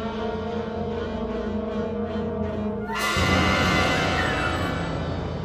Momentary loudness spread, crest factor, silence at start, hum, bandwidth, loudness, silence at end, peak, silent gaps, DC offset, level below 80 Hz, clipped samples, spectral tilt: 9 LU; 16 dB; 0 s; none; 15.5 kHz; -25 LUFS; 0 s; -8 dBFS; none; under 0.1%; -38 dBFS; under 0.1%; -5 dB/octave